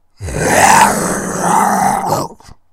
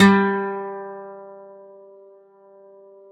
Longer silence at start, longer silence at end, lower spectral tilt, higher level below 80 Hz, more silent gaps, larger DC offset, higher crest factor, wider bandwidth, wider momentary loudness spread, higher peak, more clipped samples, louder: first, 0.2 s vs 0 s; second, 0.2 s vs 1.65 s; second, -3.5 dB/octave vs -6.5 dB/octave; first, -38 dBFS vs -60 dBFS; neither; neither; second, 14 dB vs 22 dB; first, 18 kHz vs 9.4 kHz; second, 11 LU vs 27 LU; about the same, 0 dBFS vs -2 dBFS; first, 0.2% vs under 0.1%; first, -12 LUFS vs -22 LUFS